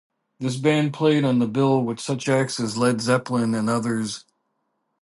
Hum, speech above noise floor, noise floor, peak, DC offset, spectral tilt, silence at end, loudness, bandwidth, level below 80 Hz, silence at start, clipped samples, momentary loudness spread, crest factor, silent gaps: none; 52 dB; -74 dBFS; -6 dBFS; under 0.1%; -5.5 dB/octave; 0.85 s; -22 LUFS; 11.5 kHz; -66 dBFS; 0.4 s; under 0.1%; 7 LU; 16 dB; none